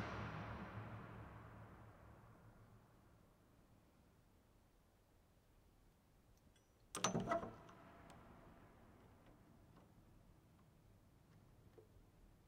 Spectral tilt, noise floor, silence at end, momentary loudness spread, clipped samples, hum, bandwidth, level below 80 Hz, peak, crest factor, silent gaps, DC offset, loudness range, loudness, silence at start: -4 dB/octave; -73 dBFS; 0 s; 25 LU; under 0.1%; none; 15.5 kHz; -70 dBFS; -22 dBFS; 32 dB; none; under 0.1%; 19 LU; -48 LUFS; 0 s